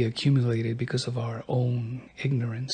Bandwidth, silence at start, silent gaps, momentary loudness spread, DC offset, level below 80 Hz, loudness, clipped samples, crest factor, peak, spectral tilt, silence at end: 9.4 kHz; 0 s; none; 8 LU; under 0.1%; -62 dBFS; -28 LUFS; under 0.1%; 14 dB; -12 dBFS; -6.5 dB/octave; 0 s